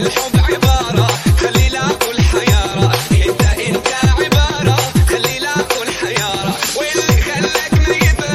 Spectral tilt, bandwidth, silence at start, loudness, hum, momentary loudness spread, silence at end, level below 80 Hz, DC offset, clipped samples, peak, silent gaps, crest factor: -4.5 dB/octave; 16 kHz; 0 s; -14 LUFS; none; 4 LU; 0 s; -20 dBFS; under 0.1%; under 0.1%; 0 dBFS; none; 12 dB